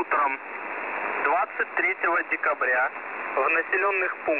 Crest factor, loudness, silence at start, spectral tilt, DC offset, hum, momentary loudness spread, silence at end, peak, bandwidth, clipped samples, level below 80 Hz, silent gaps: 14 dB; -25 LUFS; 0 s; -0.5 dB/octave; 0.1%; none; 8 LU; 0 s; -12 dBFS; 4 kHz; under 0.1%; -74 dBFS; none